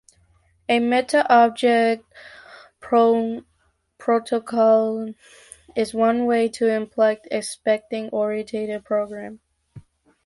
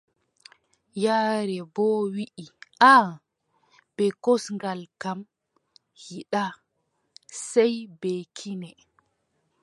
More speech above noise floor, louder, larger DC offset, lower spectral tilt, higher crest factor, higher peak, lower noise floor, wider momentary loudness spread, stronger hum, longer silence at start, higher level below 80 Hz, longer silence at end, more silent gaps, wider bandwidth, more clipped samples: second, 46 dB vs 51 dB; first, -21 LUFS vs -24 LUFS; neither; about the same, -4.5 dB/octave vs -4.5 dB/octave; second, 18 dB vs 24 dB; about the same, -2 dBFS vs -2 dBFS; second, -66 dBFS vs -75 dBFS; second, 13 LU vs 21 LU; neither; second, 0.7 s vs 0.95 s; first, -64 dBFS vs -78 dBFS; second, 0.45 s vs 0.9 s; neither; about the same, 11.5 kHz vs 11.5 kHz; neither